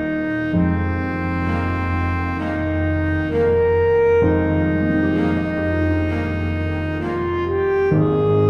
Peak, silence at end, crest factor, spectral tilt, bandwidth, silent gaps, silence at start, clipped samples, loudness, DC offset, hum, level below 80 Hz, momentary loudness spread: -4 dBFS; 0 s; 14 dB; -9.5 dB/octave; 6 kHz; none; 0 s; under 0.1%; -19 LUFS; under 0.1%; none; -34 dBFS; 6 LU